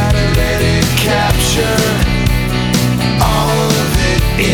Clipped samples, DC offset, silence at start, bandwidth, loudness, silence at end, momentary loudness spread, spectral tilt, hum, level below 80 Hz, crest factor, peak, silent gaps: under 0.1%; under 0.1%; 0 s; over 20 kHz; -13 LUFS; 0 s; 2 LU; -4.5 dB/octave; none; -20 dBFS; 12 dB; 0 dBFS; none